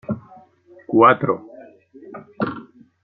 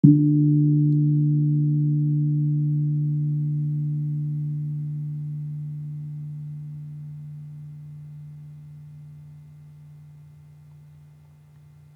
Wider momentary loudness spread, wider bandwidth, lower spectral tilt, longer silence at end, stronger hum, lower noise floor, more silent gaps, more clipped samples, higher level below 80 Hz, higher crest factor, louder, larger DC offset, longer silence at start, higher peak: first, 26 LU vs 23 LU; first, 4.7 kHz vs 0.9 kHz; second, -10 dB/octave vs -13.5 dB/octave; second, 0.4 s vs 1.65 s; neither; about the same, -50 dBFS vs -50 dBFS; neither; neither; first, -64 dBFS vs -70 dBFS; about the same, 20 dB vs 24 dB; first, -19 LUFS vs -23 LUFS; neither; about the same, 0.1 s vs 0.05 s; about the same, -2 dBFS vs -2 dBFS